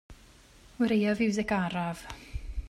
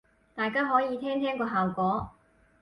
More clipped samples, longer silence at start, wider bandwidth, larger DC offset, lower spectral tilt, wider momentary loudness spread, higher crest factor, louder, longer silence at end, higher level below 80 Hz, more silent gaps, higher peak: neither; second, 0.1 s vs 0.35 s; first, 13 kHz vs 10.5 kHz; neither; second, -6 dB/octave vs -8 dB/octave; first, 16 LU vs 8 LU; about the same, 16 dB vs 18 dB; about the same, -29 LUFS vs -28 LUFS; second, 0 s vs 0.5 s; first, -44 dBFS vs -58 dBFS; neither; second, -16 dBFS vs -12 dBFS